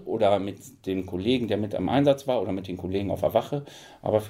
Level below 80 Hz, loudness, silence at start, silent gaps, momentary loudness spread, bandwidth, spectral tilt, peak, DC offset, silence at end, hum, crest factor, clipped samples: -62 dBFS; -26 LUFS; 0 s; none; 11 LU; 16 kHz; -7 dB/octave; -8 dBFS; under 0.1%; 0 s; none; 18 dB; under 0.1%